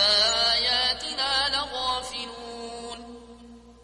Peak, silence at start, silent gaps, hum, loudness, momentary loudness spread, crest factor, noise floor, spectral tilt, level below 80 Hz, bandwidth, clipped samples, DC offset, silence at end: -10 dBFS; 0 s; none; 60 Hz at -50 dBFS; -23 LUFS; 18 LU; 16 dB; -48 dBFS; -0.5 dB/octave; -52 dBFS; 11.5 kHz; under 0.1%; under 0.1%; 0.1 s